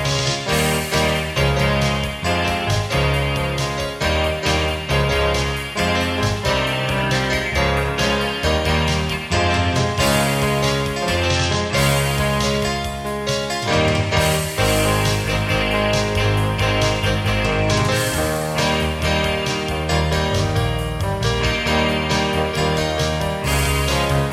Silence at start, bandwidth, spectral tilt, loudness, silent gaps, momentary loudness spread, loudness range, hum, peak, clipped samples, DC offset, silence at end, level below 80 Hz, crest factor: 0 s; 16 kHz; -4.5 dB/octave; -19 LUFS; none; 4 LU; 1 LU; none; -4 dBFS; under 0.1%; under 0.1%; 0 s; -30 dBFS; 14 dB